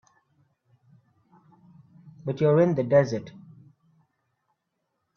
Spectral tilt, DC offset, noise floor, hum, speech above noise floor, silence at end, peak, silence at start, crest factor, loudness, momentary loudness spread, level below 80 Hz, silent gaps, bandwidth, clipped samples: -8.5 dB/octave; under 0.1%; -79 dBFS; none; 57 dB; 1.8 s; -6 dBFS; 2.05 s; 22 dB; -23 LUFS; 16 LU; -66 dBFS; none; 7 kHz; under 0.1%